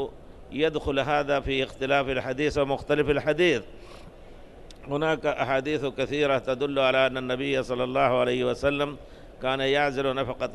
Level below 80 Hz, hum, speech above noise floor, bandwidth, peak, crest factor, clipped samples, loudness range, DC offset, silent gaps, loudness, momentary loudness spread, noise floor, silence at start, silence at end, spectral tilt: -46 dBFS; none; 20 dB; 12 kHz; -10 dBFS; 16 dB; under 0.1%; 2 LU; under 0.1%; none; -26 LUFS; 7 LU; -45 dBFS; 0 s; 0 s; -5.5 dB/octave